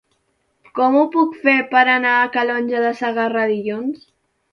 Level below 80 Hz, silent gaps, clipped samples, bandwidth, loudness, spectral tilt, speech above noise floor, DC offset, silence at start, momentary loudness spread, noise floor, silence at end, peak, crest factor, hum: -68 dBFS; none; under 0.1%; 6.8 kHz; -17 LUFS; -6 dB/octave; 50 dB; under 0.1%; 0.75 s; 11 LU; -67 dBFS; 0.55 s; -2 dBFS; 18 dB; none